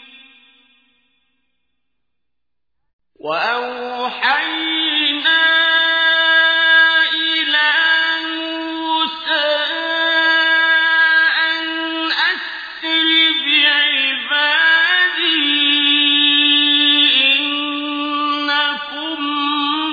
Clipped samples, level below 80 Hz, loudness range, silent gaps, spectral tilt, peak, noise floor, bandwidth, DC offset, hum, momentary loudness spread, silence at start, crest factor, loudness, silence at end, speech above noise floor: under 0.1%; -66 dBFS; 8 LU; 2.93-2.99 s; -1.5 dB/octave; -2 dBFS; -82 dBFS; 5 kHz; under 0.1%; none; 10 LU; 0.15 s; 14 dB; -13 LUFS; 0 s; 64 dB